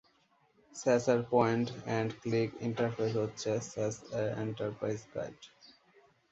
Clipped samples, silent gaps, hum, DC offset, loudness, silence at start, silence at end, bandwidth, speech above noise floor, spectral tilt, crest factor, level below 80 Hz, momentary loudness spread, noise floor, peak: under 0.1%; none; none; under 0.1%; -33 LUFS; 0.75 s; 0.85 s; 8.2 kHz; 37 dB; -6 dB/octave; 22 dB; -68 dBFS; 13 LU; -70 dBFS; -14 dBFS